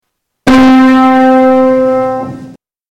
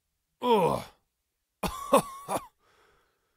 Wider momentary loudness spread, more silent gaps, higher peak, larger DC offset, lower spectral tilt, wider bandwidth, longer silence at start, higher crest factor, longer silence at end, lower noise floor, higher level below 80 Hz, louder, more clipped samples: about the same, 11 LU vs 11 LU; neither; first, -2 dBFS vs -8 dBFS; neither; first, -6 dB/octave vs -4.5 dB/octave; second, 9.4 kHz vs 16 kHz; about the same, 0.45 s vs 0.4 s; second, 6 dB vs 22 dB; second, 0.4 s vs 0.9 s; second, -33 dBFS vs -81 dBFS; first, -36 dBFS vs -56 dBFS; first, -7 LUFS vs -29 LUFS; neither